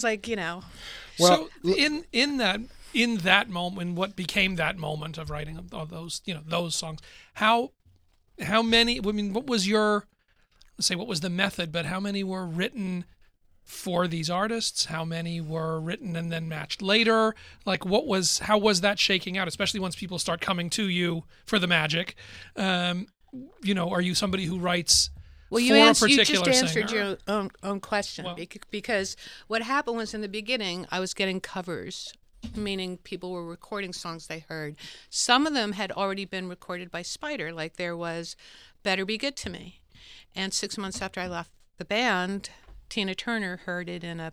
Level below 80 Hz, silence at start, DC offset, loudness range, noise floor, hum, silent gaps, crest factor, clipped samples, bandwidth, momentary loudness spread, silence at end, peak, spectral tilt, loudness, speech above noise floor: -54 dBFS; 0 s; under 0.1%; 10 LU; -63 dBFS; none; none; 24 dB; under 0.1%; 16 kHz; 16 LU; 0 s; -2 dBFS; -3.5 dB/octave; -26 LUFS; 35 dB